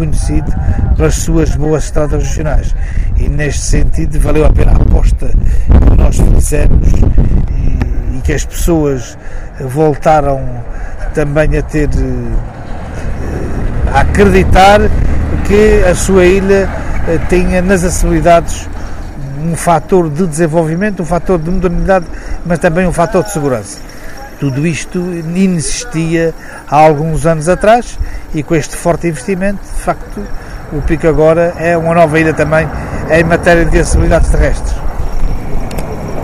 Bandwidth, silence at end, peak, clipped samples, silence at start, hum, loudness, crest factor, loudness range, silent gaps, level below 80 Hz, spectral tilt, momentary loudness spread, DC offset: 15 kHz; 0 s; 0 dBFS; 0.8%; 0 s; none; -12 LUFS; 10 dB; 5 LU; none; -14 dBFS; -6 dB/octave; 13 LU; under 0.1%